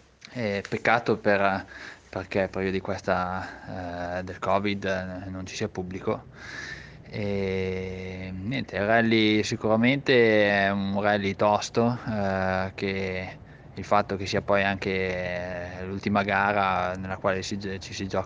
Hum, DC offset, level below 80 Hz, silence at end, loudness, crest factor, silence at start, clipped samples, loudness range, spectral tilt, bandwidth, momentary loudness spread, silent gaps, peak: none; under 0.1%; -54 dBFS; 0 s; -26 LUFS; 22 dB; 0.25 s; under 0.1%; 8 LU; -5.5 dB/octave; 9.6 kHz; 15 LU; none; -6 dBFS